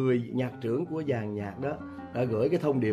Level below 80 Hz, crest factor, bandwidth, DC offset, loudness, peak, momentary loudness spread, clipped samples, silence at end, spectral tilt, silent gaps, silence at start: -64 dBFS; 14 dB; 13 kHz; under 0.1%; -30 LUFS; -16 dBFS; 8 LU; under 0.1%; 0 s; -9 dB/octave; none; 0 s